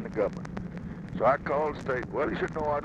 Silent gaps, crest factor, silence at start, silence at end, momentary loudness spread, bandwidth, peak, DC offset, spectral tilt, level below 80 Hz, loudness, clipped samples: none; 18 dB; 0 s; 0 s; 12 LU; 9.6 kHz; -12 dBFS; under 0.1%; -7.5 dB/octave; -48 dBFS; -30 LUFS; under 0.1%